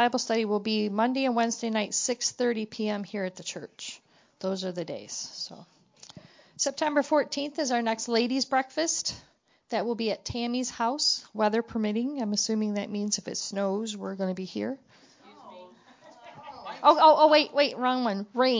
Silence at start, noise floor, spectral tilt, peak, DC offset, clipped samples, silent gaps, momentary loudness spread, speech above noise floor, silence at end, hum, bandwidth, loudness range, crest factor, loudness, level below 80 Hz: 0 s; -56 dBFS; -3 dB/octave; -6 dBFS; under 0.1%; under 0.1%; none; 12 LU; 29 dB; 0 s; none; 7.8 kHz; 10 LU; 22 dB; -27 LUFS; -66 dBFS